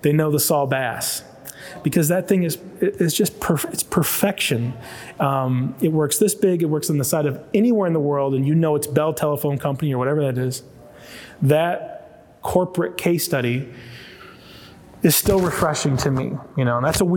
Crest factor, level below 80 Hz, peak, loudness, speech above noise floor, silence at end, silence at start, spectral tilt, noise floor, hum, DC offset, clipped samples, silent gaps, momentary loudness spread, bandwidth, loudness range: 18 dB; -46 dBFS; -4 dBFS; -20 LUFS; 23 dB; 0 s; 0.05 s; -5 dB/octave; -43 dBFS; none; under 0.1%; under 0.1%; none; 14 LU; over 20 kHz; 3 LU